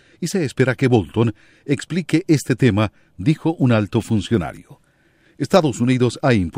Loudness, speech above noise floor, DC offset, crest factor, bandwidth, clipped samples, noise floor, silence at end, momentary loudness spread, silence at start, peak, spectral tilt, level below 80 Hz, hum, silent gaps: -19 LUFS; 39 dB; under 0.1%; 18 dB; 15.5 kHz; under 0.1%; -57 dBFS; 0 s; 8 LU; 0.2 s; 0 dBFS; -6.5 dB/octave; -48 dBFS; none; none